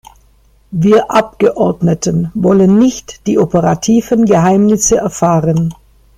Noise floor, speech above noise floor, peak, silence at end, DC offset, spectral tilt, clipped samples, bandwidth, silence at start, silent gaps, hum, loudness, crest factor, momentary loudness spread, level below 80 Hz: -49 dBFS; 38 dB; 0 dBFS; 0.45 s; under 0.1%; -6 dB/octave; under 0.1%; 15.5 kHz; 0.7 s; none; none; -11 LUFS; 12 dB; 6 LU; -40 dBFS